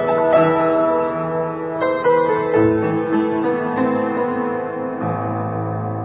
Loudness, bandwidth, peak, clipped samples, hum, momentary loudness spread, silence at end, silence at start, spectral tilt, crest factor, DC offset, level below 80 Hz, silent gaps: -19 LUFS; 4 kHz; -4 dBFS; under 0.1%; none; 8 LU; 0 s; 0 s; -11.5 dB/octave; 14 dB; under 0.1%; -52 dBFS; none